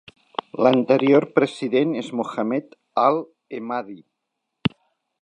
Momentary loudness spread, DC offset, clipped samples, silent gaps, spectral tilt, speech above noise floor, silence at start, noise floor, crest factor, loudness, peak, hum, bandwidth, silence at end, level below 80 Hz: 16 LU; under 0.1%; under 0.1%; none; -7 dB/octave; 59 dB; 0.55 s; -79 dBFS; 20 dB; -21 LUFS; -2 dBFS; none; 9.8 kHz; 0.55 s; -62 dBFS